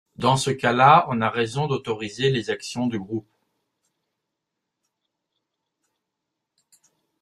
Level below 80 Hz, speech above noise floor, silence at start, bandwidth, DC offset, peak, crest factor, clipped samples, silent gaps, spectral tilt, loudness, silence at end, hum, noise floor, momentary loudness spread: -62 dBFS; 61 dB; 0.2 s; 13 kHz; under 0.1%; -2 dBFS; 22 dB; under 0.1%; none; -5 dB/octave; -21 LUFS; 4 s; none; -82 dBFS; 14 LU